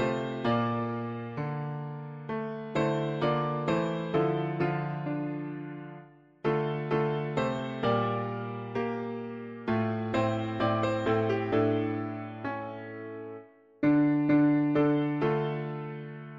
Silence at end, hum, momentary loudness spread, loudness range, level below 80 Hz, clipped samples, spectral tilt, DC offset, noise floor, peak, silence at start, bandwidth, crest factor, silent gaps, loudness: 0 s; none; 14 LU; 4 LU; -62 dBFS; under 0.1%; -8 dB/octave; under 0.1%; -51 dBFS; -14 dBFS; 0 s; 7.4 kHz; 16 dB; none; -30 LUFS